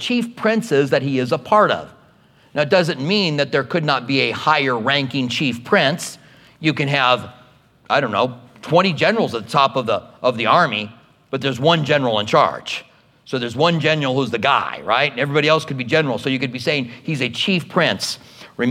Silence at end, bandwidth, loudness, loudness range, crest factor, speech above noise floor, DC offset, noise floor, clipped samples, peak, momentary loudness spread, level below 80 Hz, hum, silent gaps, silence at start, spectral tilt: 0 s; 16 kHz; -18 LUFS; 2 LU; 18 dB; 34 dB; under 0.1%; -52 dBFS; under 0.1%; 0 dBFS; 9 LU; -64 dBFS; none; none; 0 s; -5 dB/octave